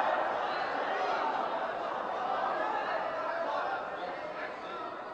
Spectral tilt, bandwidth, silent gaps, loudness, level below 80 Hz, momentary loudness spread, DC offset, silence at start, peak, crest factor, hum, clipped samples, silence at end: -4 dB/octave; 9 kHz; none; -34 LUFS; -72 dBFS; 8 LU; under 0.1%; 0 s; -16 dBFS; 18 dB; none; under 0.1%; 0 s